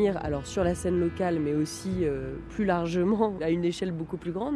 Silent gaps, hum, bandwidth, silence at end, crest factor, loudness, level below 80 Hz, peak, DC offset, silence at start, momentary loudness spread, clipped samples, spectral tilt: none; none; 13 kHz; 0 s; 16 dB; -28 LUFS; -48 dBFS; -12 dBFS; under 0.1%; 0 s; 6 LU; under 0.1%; -6.5 dB/octave